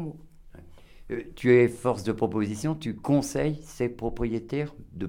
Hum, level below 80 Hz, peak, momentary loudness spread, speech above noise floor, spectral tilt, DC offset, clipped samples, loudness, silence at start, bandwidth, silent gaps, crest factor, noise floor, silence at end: none; -46 dBFS; -8 dBFS; 16 LU; 21 dB; -6.5 dB/octave; under 0.1%; under 0.1%; -27 LUFS; 0 s; 16.5 kHz; none; 20 dB; -48 dBFS; 0 s